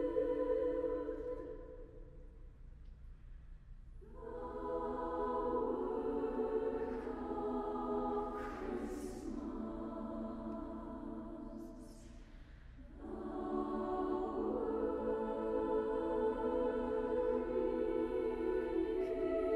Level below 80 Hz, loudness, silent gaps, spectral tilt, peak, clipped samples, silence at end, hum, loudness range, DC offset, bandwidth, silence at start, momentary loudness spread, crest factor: -54 dBFS; -39 LUFS; none; -7.5 dB/octave; -24 dBFS; under 0.1%; 0 s; none; 11 LU; under 0.1%; 11.5 kHz; 0 s; 22 LU; 16 dB